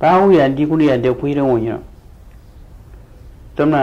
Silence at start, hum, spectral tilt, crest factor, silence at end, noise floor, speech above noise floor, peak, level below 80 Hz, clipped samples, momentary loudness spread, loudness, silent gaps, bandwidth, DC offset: 0 s; none; -8.5 dB/octave; 14 dB; 0 s; -40 dBFS; 26 dB; -2 dBFS; -40 dBFS; under 0.1%; 14 LU; -15 LUFS; none; 7.6 kHz; under 0.1%